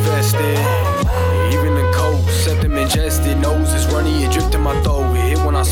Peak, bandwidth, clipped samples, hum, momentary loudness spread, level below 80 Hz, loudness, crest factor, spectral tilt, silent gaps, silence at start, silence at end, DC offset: -4 dBFS; 17.5 kHz; under 0.1%; none; 1 LU; -22 dBFS; -16 LUFS; 10 dB; -5.5 dB/octave; none; 0 s; 0 s; under 0.1%